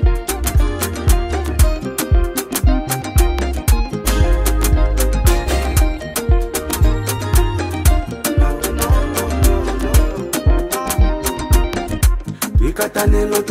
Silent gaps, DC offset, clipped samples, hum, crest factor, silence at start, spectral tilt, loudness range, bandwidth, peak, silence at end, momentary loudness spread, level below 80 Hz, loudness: none; under 0.1%; under 0.1%; none; 14 dB; 0 s; -5 dB/octave; 1 LU; 16.5 kHz; 0 dBFS; 0 s; 3 LU; -16 dBFS; -17 LUFS